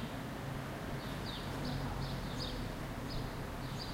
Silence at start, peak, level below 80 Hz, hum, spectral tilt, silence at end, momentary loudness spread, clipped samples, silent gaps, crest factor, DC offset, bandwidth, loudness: 0 s; -28 dBFS; -48 dBFS; none; -5.5 dB/octave; 0 s; 3 LU; under 0.1%; none; 12 dB; under 0.1%; 16 kHz; -41 LUFS